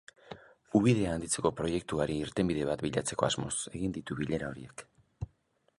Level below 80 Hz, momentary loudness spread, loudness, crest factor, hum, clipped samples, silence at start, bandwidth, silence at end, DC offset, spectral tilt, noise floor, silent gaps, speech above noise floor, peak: -54 dBFS; 20 LU; -32 LUFS; 22 dB; none; under 0.1%; 0.25 s; 11.5 kHz; 0.55 s; under 0.1%; -5 dB/octave; -72 dBFS; none; 41 dB; -10 dBFS